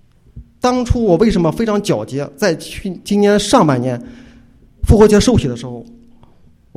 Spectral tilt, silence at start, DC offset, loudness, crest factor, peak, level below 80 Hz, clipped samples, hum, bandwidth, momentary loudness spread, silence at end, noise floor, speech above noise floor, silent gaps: -6 dB/octave; 0.35 s; under 0.1%; -14 LUFS; 16 dB; 0 dBFS; -28 dBFS; under 0.1%; none; 15.5 kHz; 16 LU; 0.95 s; -47 dBFS; 33 dB; none